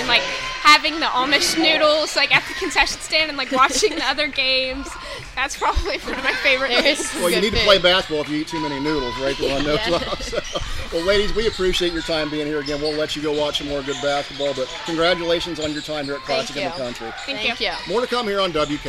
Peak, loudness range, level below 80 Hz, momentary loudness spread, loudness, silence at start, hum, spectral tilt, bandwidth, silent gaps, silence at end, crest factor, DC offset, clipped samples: 0 dBFS; 6 LU; -36 dBFS; 10 LU; -19 LUFS; 0 s; none; -2.5 dB/octave; 16 kHz; none; 0 s; 20 dB; under 0.1%; under 0.1%